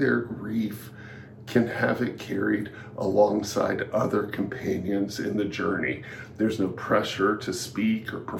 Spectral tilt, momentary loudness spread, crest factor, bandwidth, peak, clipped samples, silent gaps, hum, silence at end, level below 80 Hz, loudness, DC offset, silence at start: -5.5 dB/octave; 10 LU; 20 dB; 17.5 kHz; -8 dBFS; under 0.1%; none; none; 0 s; -60 dBFS; -27 LUFS; under 0.1%; 0 s